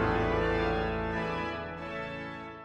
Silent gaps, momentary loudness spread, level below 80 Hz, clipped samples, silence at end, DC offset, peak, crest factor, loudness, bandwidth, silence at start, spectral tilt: none; 10 LU; -44 dBFS; under 0.1%; 0 s; under 0.1%; -16 dBFS; 16 dB; -32 LUFS; 8.8 kHz; 0 s; -7 dB/octave